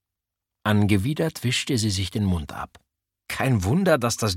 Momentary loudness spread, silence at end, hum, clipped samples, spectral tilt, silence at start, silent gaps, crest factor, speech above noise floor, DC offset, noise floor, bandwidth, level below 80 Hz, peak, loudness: 12 LU; 0 s; none; under 0.1%; -5 dB/octave; 0.65 s; none; 18 dB; 63 dB; under 0.1%; -86 dBFS; 16.5 kHz; -46 dBFS; -6 dBFS; -23 LUFS